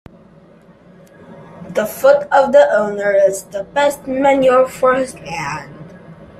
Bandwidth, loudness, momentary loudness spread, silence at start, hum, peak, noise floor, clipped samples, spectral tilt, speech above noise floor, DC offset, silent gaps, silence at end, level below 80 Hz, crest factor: 14.5 kHz; -15 LUFS; 13 LU; 1.3 s; none; 0 dBFS; -45 dBFS; under 0.1%; -4.5 dB/octave; 31 dB; under 0.1%; none; 0.15 s; -52 dBFS; 16 dB